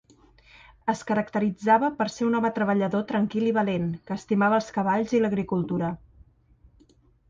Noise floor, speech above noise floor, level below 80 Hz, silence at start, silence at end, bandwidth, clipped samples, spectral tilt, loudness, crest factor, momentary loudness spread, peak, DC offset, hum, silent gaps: -59 dBFS; 35 dB; -58 dBFS; 0.85 s; 1.35 s; 7.6 kHz; under 0.1%; -7 dB/octave; -25 LUFS; 18 dB; 8 LU; -8 dBFS; under 0.1%; none; none